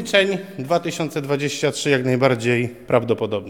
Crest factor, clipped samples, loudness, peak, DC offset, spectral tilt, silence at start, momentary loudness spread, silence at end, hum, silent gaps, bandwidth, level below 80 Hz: 18 dB; under 0.1%; -20 LUFS; -2 dBFS; 0.2%; -5 dB/octave; 0 s; 5 LU; 0 s; none; none; 18.5 kHz; -60 dBFS